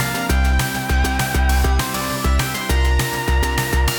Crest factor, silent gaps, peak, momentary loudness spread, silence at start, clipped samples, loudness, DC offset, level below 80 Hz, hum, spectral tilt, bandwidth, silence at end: 12 dB; none; -6 dBFS; 2 LU; 0 s; under 0.1%; -19 LUFS; under 0.1%; -20 dBFS; none; -4 dB/octave; 19 kHz; 0 s